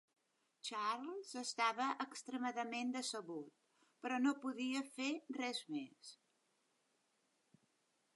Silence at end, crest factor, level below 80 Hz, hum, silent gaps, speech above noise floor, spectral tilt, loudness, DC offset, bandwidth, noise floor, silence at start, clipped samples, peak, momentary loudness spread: 2 s; 20 dB; under -90 dBFS; none; none; 39 dB; -2 dB/octave; -42 LUFS; under 0.1%; 11.5 kHz; -82 dBFS; 0.65 s; under 0.1%; -26 dBFS; 12 LU